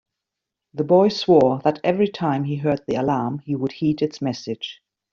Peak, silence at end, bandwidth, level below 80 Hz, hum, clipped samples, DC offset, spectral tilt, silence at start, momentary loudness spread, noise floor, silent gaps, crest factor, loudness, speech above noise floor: -4 dBFS; 0.4 s; 7.4 kHz; -60 dBFS; none; under 0.1%; under 0.1%; -6 dB/octave; 0.75 s; 13 LU; -84 dBFS; none; 18 dB; -21 LUFS; 64 dB